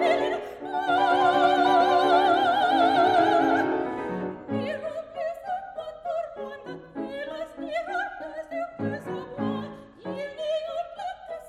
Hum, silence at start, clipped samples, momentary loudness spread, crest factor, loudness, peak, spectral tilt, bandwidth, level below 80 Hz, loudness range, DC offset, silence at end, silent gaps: none; 0 s; under 0.1%; 16 LU; 16 dB; -25 LUFS; -10 dBFS; -5.5 dB/octave; 12.5 kHz; -62 dBFS; 12 LU; under 0.1%; 0 s; none